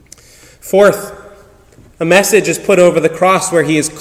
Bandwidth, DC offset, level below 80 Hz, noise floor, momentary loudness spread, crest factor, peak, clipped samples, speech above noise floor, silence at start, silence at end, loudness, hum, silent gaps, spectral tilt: 16.5 kHz; under 0.1%; -48 dBFS; -43 dBFS; 9 LU; 12 dB; 0 dBFS; 0.6%; 32 dB; 0.65 s; 0 s; -11 LUFS; none; none; -4 dB/octave